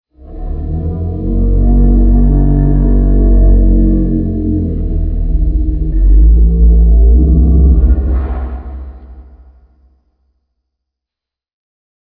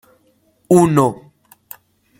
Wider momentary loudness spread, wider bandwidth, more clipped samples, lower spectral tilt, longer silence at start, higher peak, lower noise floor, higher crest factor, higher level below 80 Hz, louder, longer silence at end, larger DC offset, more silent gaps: second, 12 LU vs 26 LU; second, 1.9 kHz vs 17 kHz; neither; first, -14 dB/octave vs -7.5 dB/octave; second, 0.25 s vs 0.7 s; about the same, 0 dBFS vs -2 dBFS; first, -85 dBFS vs -58 dBFS; second, 10 dB vs 18 dB; first, -10 dBFS vs -54 dBFS; about the same, -12 LUFS vs -14 LUFS; first, 2.8 s vs 1.05 s; neither; neither